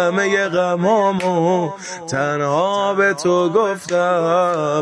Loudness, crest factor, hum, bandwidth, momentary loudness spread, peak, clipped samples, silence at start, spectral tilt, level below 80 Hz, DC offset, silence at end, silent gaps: -17 LUFS; 14 dB; none; 11 kHz; 5 LU; -4 dBFS; under 0.1%; 0 s; -5 dB/octave; -62 dBFS; under 0.1%; 0 s; none